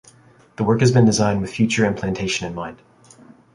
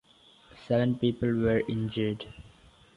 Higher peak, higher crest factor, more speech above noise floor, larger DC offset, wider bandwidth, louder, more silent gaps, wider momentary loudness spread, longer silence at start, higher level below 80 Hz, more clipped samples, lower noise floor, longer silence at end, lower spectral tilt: first, -2 dBFS vs -12 dBFS; about the same, 18 dB vs 18 dB; about the same, 32 dB vs 30 dB; neither; about the same, 11.5 kHz vs 10.5 kHz; first, -19 LUFS vs -29 LUFS; neither; first, 13 LU vs 8 LU; about the same, 0.6 s vs 0.55 s; first, -48 dBFS vs -54 dBFS; neither; second, -50 dBFS vs -58 dBFS; first, 0.8 s vs 0.5 s; second, -5.5 dB/octave vs -8.5 dB/octave